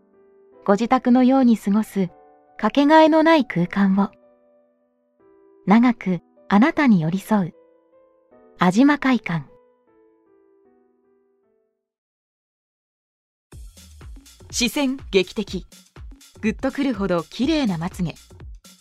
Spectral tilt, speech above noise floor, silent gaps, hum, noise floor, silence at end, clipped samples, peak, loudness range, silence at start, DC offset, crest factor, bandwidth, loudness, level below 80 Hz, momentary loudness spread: -6 dB/octave; 50 dB; 11.98-13.50 s; none; -69 dBFS; 0.25 s; under 0.1%; -2 dBFS; 9 LU; 0.65 s; under 0.1%; 20 dB; 14.5 kHz; -19 LUFS; -48 dBFS; 13 LU